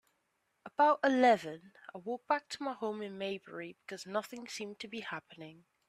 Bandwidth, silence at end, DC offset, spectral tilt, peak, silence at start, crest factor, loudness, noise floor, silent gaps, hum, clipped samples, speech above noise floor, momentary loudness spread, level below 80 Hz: 14.5 kHz; 0.35 s; under 0.1%; -4 dB/octave; -16 dBFS; 0.65 s; 20 dB; -34 LUFS; -80 dBFS; none; none; under 0.1%; 45 dB; 19 LU; -82 dBFS